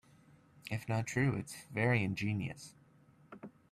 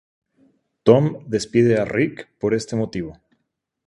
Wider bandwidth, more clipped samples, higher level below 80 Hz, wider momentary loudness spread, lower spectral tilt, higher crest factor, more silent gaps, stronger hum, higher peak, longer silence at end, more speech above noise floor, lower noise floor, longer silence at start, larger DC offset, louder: first, 14 kHz vs 11.5 kHz; neither; second, -68 dBFS vs -54 dBFS; first, 21 LU vs 11 LU; about the same, -6 dB/octave vs -7 dB/octave; about the same, 20 dB vs 20 dB; neither; neither; second, -18 dBFS vs 0 dBFS; second, 0.25 s vs 0.75 s; second, 29 dB vs 56 dB; second, -64 dBFS vs -75 dBFS; second, 0.65 s vs 0.85 s; neither; second, -36 LUFS vs -20 LUFS